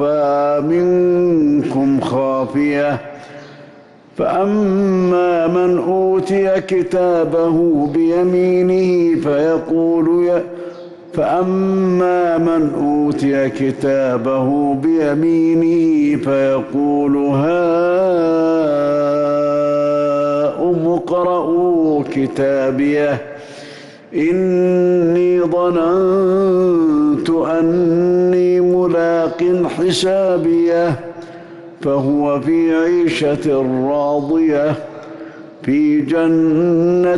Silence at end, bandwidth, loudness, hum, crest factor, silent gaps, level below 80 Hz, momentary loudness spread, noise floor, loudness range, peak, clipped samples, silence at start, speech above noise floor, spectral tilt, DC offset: 0 s; 11.5 kHz; -15 LUFS; none; 8 dB; none; -52 dBFS; 6 LU; -42 dBFS; 3 LU; -8 dBFS; under 0.1%; 0 s; 28 dB; -7.5 dB/octave; under 0.1%